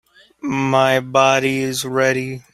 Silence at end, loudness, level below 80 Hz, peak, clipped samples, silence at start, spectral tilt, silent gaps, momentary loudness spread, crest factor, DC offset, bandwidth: 0.15 s; -17 LUFS; -58 dBFS; -2 dBFS; under 0.1%; 0.45 s; -4.5 dB/octave; none; 9 LU; 16 dB; under 0.1%; 16 kHz